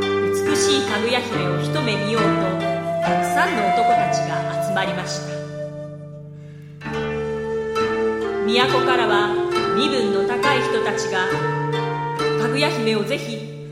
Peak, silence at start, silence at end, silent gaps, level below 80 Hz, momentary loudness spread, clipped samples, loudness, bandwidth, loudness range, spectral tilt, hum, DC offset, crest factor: -2 dBFS; 0 s; 0 s; none; -52 dBFS; 12 LU; under 0.1%; -20 LUFS; 16 kHz; 7 LU; -4.5 dB/octave; none; under 0.1%; 20 dB